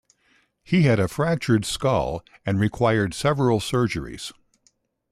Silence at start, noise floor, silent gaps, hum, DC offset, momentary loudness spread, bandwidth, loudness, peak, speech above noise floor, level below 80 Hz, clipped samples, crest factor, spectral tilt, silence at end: 0.7 s; -66 dBFS; none; none; under 0.1%; 10 LU; 14.5 kHz; -22 LUFS; -8 dBFS; 44 dB; -48 dBFS; under 0.1%; 16 dB; -6 dB/octave; 0.8 s